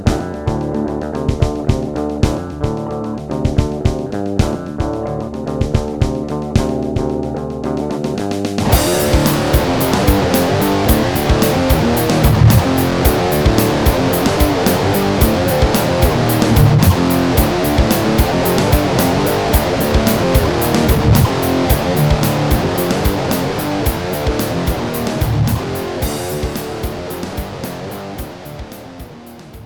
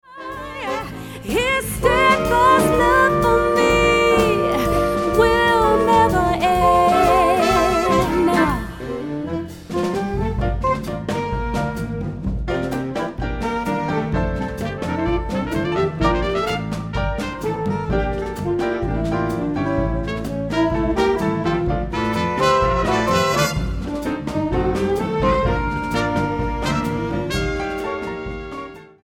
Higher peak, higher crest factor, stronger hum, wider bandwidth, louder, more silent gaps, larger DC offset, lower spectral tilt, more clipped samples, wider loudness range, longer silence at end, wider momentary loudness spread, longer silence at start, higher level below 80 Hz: about the same, 0 dBFS vs -2 dBFS; about the same, 14 dB vs 18 dB; neither; first, 19.5 kHz vs 17.5 kHz; first, -15 LUFS vs -19 LUFS; neither; second, under 0.1% vs 0.2%; about the same, -6 dB/octave vs -5.5 dB/octave; neither; about the same, 6 LU vs 8 LU; second, 0 s vs 0.15 s; about the same, 10 LU vs 11 LU; about the same, 0 s vs 0.1 s; first, -24 dBFS vs -32 dBFS